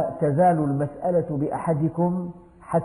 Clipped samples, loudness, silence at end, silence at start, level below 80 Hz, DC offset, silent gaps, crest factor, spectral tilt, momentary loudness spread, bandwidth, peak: under 0.1%; -23 LUFS; 0 s; 0 s; -54 dBFS; under 0.1%; none; 14 dB; -10.5 dB/octave; 7 LU; 10.5 kHz; -10 dBFS